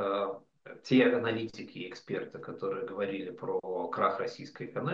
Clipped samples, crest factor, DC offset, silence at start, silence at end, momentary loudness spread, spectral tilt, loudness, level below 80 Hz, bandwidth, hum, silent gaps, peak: under 0.1%; 20 dB; under 0.1%; 0 s; 0 s; 17 LU; -6.5 dB/octave; -33 LUFS; -76 dBFS; 7.4 kHz; none; none; -12 dBFS